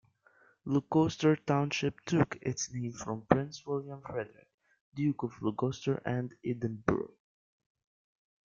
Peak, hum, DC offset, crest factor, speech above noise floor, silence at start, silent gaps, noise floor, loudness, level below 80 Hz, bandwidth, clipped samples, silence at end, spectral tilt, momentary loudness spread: -6 dBFS; none; under 0.1%; 28 dB; 34 dB; 0.65 s; 4.54-4.58 s, 4.81-4.92 s; -66 dBFS; -33 LUFS; -64 dBFS; 7.6 kHz; under 0.1%; 1.45 s; -6 dB/octave; 11 LU